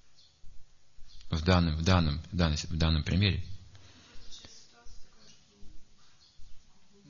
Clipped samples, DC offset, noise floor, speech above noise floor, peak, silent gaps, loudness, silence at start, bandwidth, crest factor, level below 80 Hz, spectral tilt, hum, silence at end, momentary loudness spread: under 0.1%; under 0.1%; -57 dBFS; 29 dB; -8 dBFS; none; -29 LUFS; 0.05 s; 7.4 kHz; 24 dB; -42 dBFS; -6 dB/octave; none; 0.25 s; 23 LU